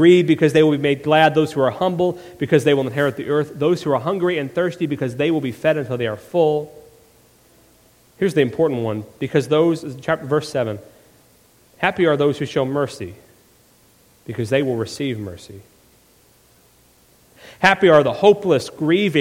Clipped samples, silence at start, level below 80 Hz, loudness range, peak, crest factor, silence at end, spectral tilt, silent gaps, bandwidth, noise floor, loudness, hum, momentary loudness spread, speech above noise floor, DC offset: under 0.1%; 0 s; -56 dBFS; 9 LU; 0 dBFS; 20 dB; 0 s; -6.5 dB/octave; none; 16 kHz; -54 dBFS; -19 LUFS; none; 11 LU; 36 dB; under 0.1%